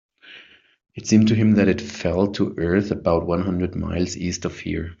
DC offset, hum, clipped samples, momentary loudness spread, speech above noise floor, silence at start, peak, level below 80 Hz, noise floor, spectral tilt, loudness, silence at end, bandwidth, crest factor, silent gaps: under 0.1%; none; under 0.1%; 11 LU; 30 dB; 0.25 s; -4 dBFS; -48 dBFS; -50 dBFS; -6.5 dB/octave; -21 LUFS; 0.05 s; 7.6 kHz; 18 dB; none